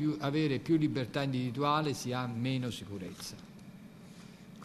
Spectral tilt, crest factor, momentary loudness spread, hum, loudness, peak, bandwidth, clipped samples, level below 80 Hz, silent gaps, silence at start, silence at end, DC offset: -6 dB/octave; 18 dB; 22 LU; none; -33 LUFS; -16 dBFS; 13.5 kHz; under 0.1%; -66 dBFS; none; 0 s; 0 s; under 0.1%